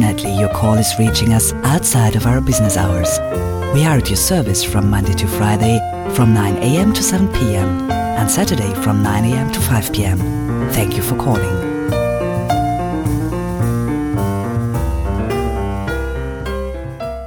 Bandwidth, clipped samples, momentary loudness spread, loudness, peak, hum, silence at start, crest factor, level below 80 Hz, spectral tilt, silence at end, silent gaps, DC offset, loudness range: 19 kHz; under 0.1%; 6 LU; -16 LUFS; -2 dBFS; none; 0 s; 12 dB; -28 dBFS; -5 dB/octave; 0 s; none; under 0.1%; 5 LU